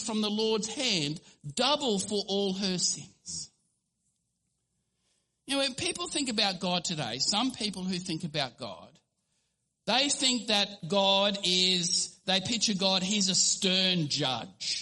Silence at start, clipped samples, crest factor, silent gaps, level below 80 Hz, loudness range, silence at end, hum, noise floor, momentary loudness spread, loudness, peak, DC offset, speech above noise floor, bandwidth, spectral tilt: 0 s; under 0.1%; 20 dB; none; -68 dBFS; 9 LU; 0 s; none; -79 dBFS; 11 LU; -27 LUFS; -10 dBFS; under 0.1%; 50 dB; 11.5 kHz; -2.5 dB/octave